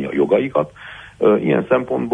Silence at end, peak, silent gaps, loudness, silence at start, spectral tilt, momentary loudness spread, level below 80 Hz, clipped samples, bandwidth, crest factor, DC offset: 0 s; -2 dBFS; none; -18 LUFS; 0 s; -8.5 dB/octave; 14 LU; -52 dBFS; under 0.1%; 9.4 kHz; 14 dB; under 0.1%